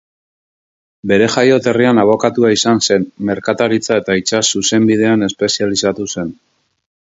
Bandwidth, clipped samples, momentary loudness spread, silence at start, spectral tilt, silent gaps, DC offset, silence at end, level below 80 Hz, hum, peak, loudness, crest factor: 8 kHz; under 0.1%; 8 LU; 1.05 s; -4 dB/octave; none; under 0.1%; 0.85 s; -52 dBFS; none; 0 dBFS; -13 LUFS; 14 dB